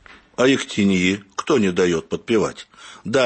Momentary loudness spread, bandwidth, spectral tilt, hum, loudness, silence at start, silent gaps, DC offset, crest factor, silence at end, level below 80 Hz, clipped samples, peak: 17 LU; 8.8 kHz; -5 dB/octave; none; -20 LUFS; 0.4 s; none; under 0.1%; 14 dB; 0 s; -54 dBFS; under 0.1%; -6 dBFS